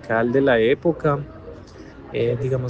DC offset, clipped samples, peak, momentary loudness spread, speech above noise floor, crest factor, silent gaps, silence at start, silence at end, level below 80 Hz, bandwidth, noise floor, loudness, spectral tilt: under 0.1%; under 0.1%; -6 dBFS; 23 LU; 21 dB; 16 dB; none; 0.05 s; 0 s; -48 dBFS; 7.6 kHz; -40 dBFS; -20 LUFS; -8 dB/octave